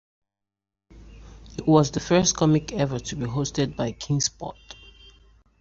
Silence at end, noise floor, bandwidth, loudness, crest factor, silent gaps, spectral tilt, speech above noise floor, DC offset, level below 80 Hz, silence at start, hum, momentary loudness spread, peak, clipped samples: 0.9 s; -87 dBFS; 7.8 kHz; -23 LUFS; 22 dB; none; -5 dB/octave; 64 dB; under 0.1%; -48 dBFS; 0.95 s; none; 19 LU; -4 dBFS; under 0.1%